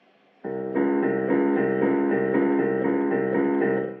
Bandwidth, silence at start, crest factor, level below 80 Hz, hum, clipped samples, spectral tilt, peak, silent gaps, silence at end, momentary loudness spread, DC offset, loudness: 3.6 kHz; 0.45 s; 14 dB; -74 dBFS; none; under 0.1%; -7.5 dB/octave; -10 dBFS; none; 0 s; 5 LU; under 0.1%; -23 LUFS